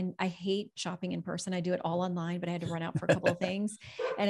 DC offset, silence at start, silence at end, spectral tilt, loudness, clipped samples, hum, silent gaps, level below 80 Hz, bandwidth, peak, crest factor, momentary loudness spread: under 0.1%; 0 s; 0 s; -5.5 dB/octave; -33 LUFS; under 0.1%; none; none; -70 dBFS; 12 kHz; -14 dBFS; 20 dB; 8 LU